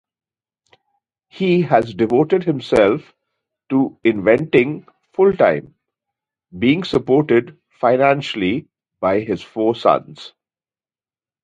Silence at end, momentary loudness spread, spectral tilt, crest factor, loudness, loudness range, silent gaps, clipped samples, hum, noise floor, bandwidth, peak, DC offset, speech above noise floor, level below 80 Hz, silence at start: 1.15 s; 9 LU; -7.5 dB/octave; 18 dB; -17 LUFS; 2 LU; none; under 0.1%; none; under -90 dBFS; 9.2 kHz; 0 dBFS; under 0.1%; over 74 dB; -54 dBFS; 1.35 s